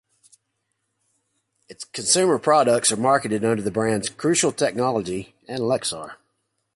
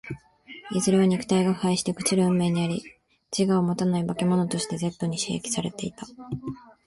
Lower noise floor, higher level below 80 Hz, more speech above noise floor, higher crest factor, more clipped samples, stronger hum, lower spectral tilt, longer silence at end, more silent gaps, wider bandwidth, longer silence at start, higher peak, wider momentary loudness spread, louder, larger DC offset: first, -75 dBFS vs -47 dBFS; about the same, -60 dBFS vs -58 dBFS; first, 54 dB vs 23 dB; about the same, 18 dB vs 16 dB; neither; neither; second, -3.5 dB/octave vs -5.5 dB/octave; first, 0.6 s vs 0.25 s; neither; about the same, 11.5 kHz vs 11.5 kHz; first, 1.7 s vs 0.05 s; first, -4 dBFS vs -10 dBFS; about the same, 15 LU vs 14 LU; first, -21 LUFS vs -25 LUFS; neither